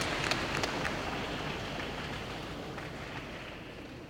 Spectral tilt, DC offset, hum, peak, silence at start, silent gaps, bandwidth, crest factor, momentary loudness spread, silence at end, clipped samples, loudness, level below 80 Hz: -4 dB/octave; under 0.1%; none; -14 dBFS; 0 s; none; 16 kHz; 24 dB; 11 LU; 0 s; under 0.1%; -36 LUFS; -52 dBFS